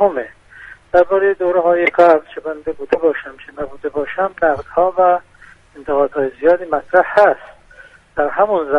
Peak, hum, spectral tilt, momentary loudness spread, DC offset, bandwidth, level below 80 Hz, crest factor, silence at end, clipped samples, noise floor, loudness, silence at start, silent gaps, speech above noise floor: 0 dBFS; none; -6.5 dB/octave; 14 LU; under 0.1%; 6 kHz; -50 dBFS; 16 dB; 0 s; under 0.1%; -44 dBFS; -16 LUFS; 0 s; none; 28 dB